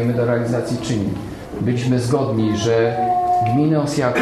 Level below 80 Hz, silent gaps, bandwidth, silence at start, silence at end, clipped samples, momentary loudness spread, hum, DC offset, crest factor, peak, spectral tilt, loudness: -46 dBFS; none; 13 kHz; 0 s; 0 s; under 0.1%; 6 LU; none; under 0.1%; 14 dB; -6 dBFS; -6.5 dB/octave; -19 LUFS